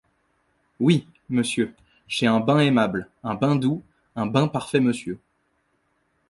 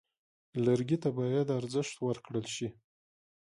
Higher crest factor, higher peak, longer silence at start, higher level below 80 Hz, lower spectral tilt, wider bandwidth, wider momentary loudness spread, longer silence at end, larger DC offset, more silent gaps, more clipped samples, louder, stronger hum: about the same, 20 dB vs 18 dB; first, -4 dBFS vs -16 dBFS; first, 0.8 s vs 0.55 s; first, -60 dBFS vs -70 dBFS; about the same, -6 dB/octave vs -6.5 dB/octave; about the same, 11.5 kHz vs 11.5 kHz; first, 12 LU vs 9 LU; first, 1.15 s vs 0.8 s; neither; neither; neither; first, -23 LUFS vs -33 LUFS; neither